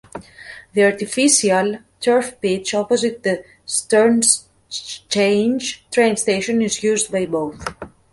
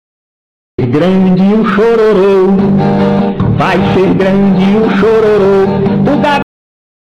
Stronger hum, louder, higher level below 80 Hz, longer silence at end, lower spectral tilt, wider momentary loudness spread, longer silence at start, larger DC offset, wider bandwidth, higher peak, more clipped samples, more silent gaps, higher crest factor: neither; second, -18 LUFS vs -9 LUFS; second, -56 dBFS vs -34 dBFS; second, 0.25 s vs 0.75 s; second, -3 dB/octave vs -8.5 dB/octave; first, 16 LU vs 4 LU; second, 0.15 s vs 0.8 s; neither; first, 11.5 kHz vs 7.2 kHz; first, 0 dBFS vs -4 dBFS; neither; neither; first, 18 dB vs 4 dB